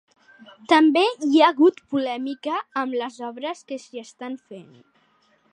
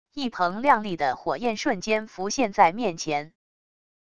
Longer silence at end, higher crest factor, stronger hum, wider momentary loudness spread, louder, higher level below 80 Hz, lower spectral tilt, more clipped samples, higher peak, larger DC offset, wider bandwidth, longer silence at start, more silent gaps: first, 0.9 s vs 0.7 s; about the same, 20 dB vs 20 dB; neither; first, 19 LU vs 9 LU; first, -21 LUFS vs -25 LUFS; second, -80 dBFS vs -60 dBFS; about the same, -4 dB/octave vs -4 dB/octave; neither; about the same, -4 dBFS vs -4 dBFS; second, under 0.1% vs 0.5%; second, 9.8 kHz vs 11 kHz; first, 0.7 s vs 0.05 s; neither